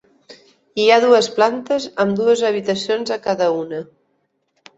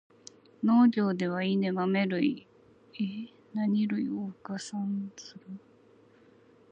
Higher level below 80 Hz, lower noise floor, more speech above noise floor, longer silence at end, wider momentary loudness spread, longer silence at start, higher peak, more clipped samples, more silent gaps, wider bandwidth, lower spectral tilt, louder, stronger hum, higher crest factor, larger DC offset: first, -64 dBFS vs -80 dBFS; first, -68 dBFS vs -60 dBFS; first, 51 dB vs 31 dB; second, 0.95 s vs 1.15 s; second, 11 LU vs 21 LU; second, 0.3 s vs 0.6 s; first, -2 dBFS vs -14 dBFS; neither; neither; second, 8 kHz vs 9.2 kHz; second, -4 dB/octave vs -6.5 dB/octave; first, -17 LUFS vs -29 LUFS; neither; about the same, 18 dB vs 18 dB; neither